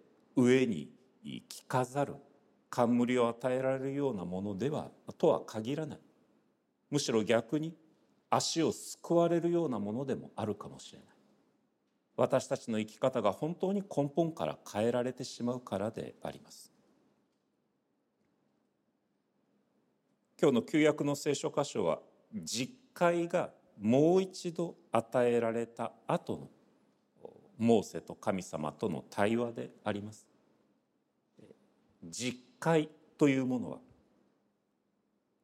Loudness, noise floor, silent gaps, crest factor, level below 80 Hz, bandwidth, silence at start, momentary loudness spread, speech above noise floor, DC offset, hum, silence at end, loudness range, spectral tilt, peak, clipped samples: -33 LUFS; -79 dBFS; none; 22 dB; -78 dBFS; 15.5 kHz; 0.35 s; 14 LU; 46 dB; under 0.1%; none; 1.65 s; 6 LU; -5.5 dB/octave; -14 dBFS; under 0.1%